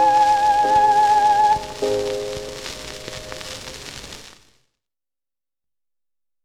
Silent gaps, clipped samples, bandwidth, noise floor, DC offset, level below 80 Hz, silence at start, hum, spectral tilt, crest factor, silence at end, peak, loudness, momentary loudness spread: none; under 0.1%; 15 kHz; under -90 dBFS; 0.3%; -48 dBFS; 0 s; none; -3 dB/octave; 16 dB; 2.15 s; -6 dBFS; -17 LUFS; 19 LU